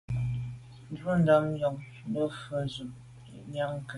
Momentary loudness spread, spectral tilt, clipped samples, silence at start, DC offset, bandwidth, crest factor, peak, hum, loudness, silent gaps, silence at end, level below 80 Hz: 22 LU; -7.5 dB/octave; under 0.1%; 0.1 s; under 0.1%; 11.5 kHz; 20 dB; -12 dBFS; none; -30 LUFS; none; 0 s; -54 dBFS